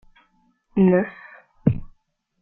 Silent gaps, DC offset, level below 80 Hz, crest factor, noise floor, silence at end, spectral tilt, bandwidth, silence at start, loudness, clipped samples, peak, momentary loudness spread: none; under 0.1%; -46 dBFS; 22 dB; -64 dBFS; 0.55 s; -12.5 dB/octave; 3.4 kHz; 0.75 s; -22 LUFS; under 0.1%; -2 dBFS; 14 LU